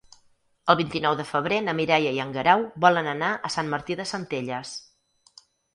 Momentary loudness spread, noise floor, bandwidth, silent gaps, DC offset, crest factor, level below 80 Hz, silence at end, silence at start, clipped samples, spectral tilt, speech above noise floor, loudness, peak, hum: 10 LU; -63 dBFS; 11.5 kHz; none; under 0.1%; 24 dB; -62 dBFS; 0.95 s; 0.65 s; under 0.1%; -4.5 dB/octave; 39 dB; -24 LUFS; -2 dBFS; none